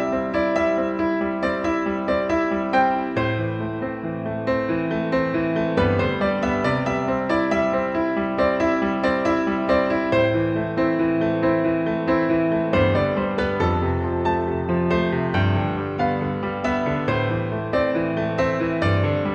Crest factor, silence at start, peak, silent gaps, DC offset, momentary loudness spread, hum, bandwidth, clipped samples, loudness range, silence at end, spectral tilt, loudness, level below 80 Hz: 16 dB; 0 s; -6 dBFS; none; under 0.1%; 4 LU; none; 8.2 kHz; under 0.1%; 2 LU; 0 s; -8 dB/octave; -22 LUFS; -42 dBFS